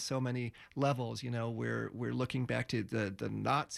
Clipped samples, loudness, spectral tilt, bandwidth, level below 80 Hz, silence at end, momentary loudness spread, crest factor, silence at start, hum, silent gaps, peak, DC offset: under 0.1%; -36 LUFS; -6 dB/octave; 13 kHz; -66 dBFS; 0 s; 4 LU; 16 dB; 0 s; none; none; -20 dBFS; under 0.1%